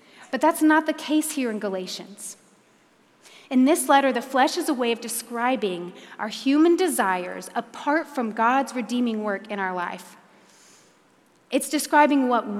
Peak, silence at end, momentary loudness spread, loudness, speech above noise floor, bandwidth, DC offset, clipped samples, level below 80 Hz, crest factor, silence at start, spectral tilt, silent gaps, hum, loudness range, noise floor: -4 dBFS; 0 s; 14 LU; -23 LUFS; 36 dB; 16 kHz; under 0.1%; under 0.1%; -88 dBFS; 20 dB; 0.2 s; -3.5 dB/octave; none; none; 4 LU; -59 dBFS